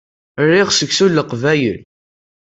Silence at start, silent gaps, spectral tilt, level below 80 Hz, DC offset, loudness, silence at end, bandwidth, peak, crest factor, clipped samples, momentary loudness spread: 0.35 s; none; -4 dB/octave; -54 dBFS; under 0.1%; -14 LUFS; 0.7 s; 8 kHz; -2 dBFS; 14 dB; under 0.1%; 12 LU